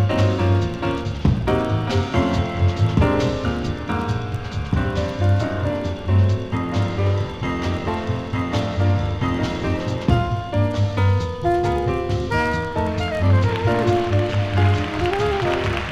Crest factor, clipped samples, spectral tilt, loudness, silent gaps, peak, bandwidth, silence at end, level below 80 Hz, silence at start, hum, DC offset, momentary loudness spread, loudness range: 16 dB; under 0.1%; -7.5 dB/octave; -21 LUFS; none; -4 dBFS; 8.2 kHz; 0 s; -34 dBFS; 0 s; none; under 0.1%; 6 LU; 2 LU